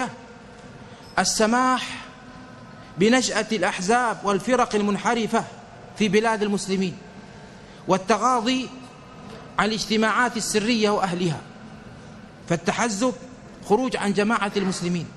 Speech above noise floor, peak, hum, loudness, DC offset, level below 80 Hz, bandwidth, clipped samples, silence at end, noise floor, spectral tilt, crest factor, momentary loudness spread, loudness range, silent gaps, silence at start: 21 dB; -6 dBFS; none; -22 LUFS; under 0.1%; -54 dBFS; 13 kHz; under 0.1%; 0 s; -43 dBFS; -4 dB/octave; 18 dB; 23 LU; 3 LU; none; 0 s